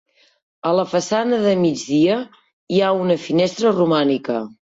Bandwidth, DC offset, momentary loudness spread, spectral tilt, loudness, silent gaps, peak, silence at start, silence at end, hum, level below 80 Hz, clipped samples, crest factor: 8 kHz; under 0.1%; 8 LU; -5.5 dB/octave; -19 LUFS; 2.53-2.67 s; -6 dBFS; 0.65 s; 0.25 s; none; -62 dBFS; under 0.1%; 14 dB